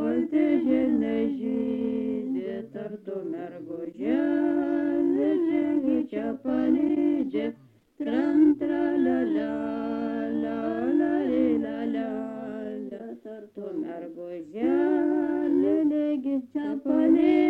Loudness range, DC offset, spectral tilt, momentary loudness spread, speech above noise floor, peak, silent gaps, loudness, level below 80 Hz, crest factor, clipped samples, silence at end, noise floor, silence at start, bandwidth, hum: 5 LU; under 0.1%; -8.5 dB/octave; 13 LU; 20 dB; -10 dBFS; none; -26 LUFS; -62 dBFS; 14 dB; under 0.1%; 0 s; -49 dBFS; 0 s; 4.5 kHz; none